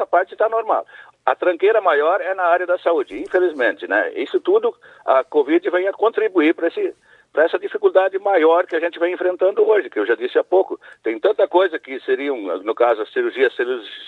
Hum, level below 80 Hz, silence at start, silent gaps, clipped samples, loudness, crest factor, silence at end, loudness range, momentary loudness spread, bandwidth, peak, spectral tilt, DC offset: none; -70 dBFS; 0 s; none; under 0.1%; -19 LUFS; 16 dB; 0 s; 2 LU; 7 LU; 4.5 kHz; -2 dBFS; -4.5 dB/octave; under 0.1%